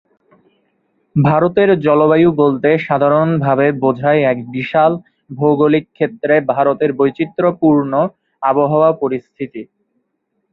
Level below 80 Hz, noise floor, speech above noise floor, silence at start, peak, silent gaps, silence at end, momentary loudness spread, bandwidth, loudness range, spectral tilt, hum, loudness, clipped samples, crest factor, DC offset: -54 dBFS; -69 dBFS; 55 dB; 1.15 s; 0 dBFS; none; 0.9 s; 9 LU; 4.8 kHz; 3 LU; -10.5 dB/octave; none; -14 LUFS; under 0.1%; 14 dB; under 0.1%